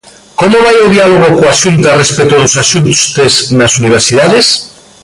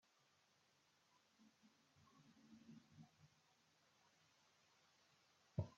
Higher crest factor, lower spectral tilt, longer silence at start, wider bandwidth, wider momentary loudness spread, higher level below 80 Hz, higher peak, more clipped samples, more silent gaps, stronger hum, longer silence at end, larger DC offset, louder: second, 6 dB vs 28 dB; second, -3.5 dB/octave vs -7.5 dB/octave; second, 0.4 s vs 1.1 s; first, 11.5 kHz vs 7.4 kHz; second, 3 LU vs 17 LU; first, -38 dBFS vs -82 dBFS; first, 0 dBFS vs -32 dBFS; neither; neither; neither; first, 0.35 s vs 0 s; neither; first, -6 LUFS vs -58 LUFS